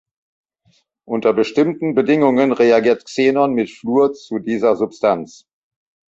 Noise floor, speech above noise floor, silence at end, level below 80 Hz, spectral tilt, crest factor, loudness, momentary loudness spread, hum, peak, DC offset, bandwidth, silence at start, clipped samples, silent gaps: -61 dBFS; 45 dB; 0.85 s; -62 dBFS; -6.5 dB/octave; 16 dB; -17 LUFS; 9 LU; none; -2 dBFS; under 0.1%; 7.8 kHz; 1.1 s; under 0.1%; none